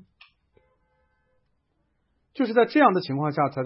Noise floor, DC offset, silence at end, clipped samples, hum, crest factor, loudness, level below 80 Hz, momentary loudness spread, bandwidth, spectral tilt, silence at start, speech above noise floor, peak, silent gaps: -72 dBFS; under 0.1%; 0 s; under 0.1%; none; 22 dB; -22 LUFS; -72 dBFS; 10 LU; 5.8 kHz; -11 dB/octave; 2.35 s; 50 dB; -6 dBFS; none